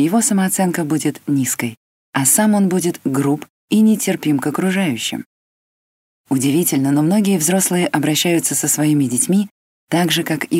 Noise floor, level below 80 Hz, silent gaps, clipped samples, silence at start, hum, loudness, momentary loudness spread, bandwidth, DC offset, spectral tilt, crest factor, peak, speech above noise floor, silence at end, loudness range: under -90 dBFS; -66 dBFS; 1.77-2.13 s, 3.50-3.68 s, 5.26-6.24 s, 9.51-9.87 s; under 0.1%; 0 s; none; -16 LUFS; 7 LU; 16.5 kHz; under 0.1%; -4 dB/octave; 16 dB; 0 dBFS; over 74 dB; 0 s; 3 LU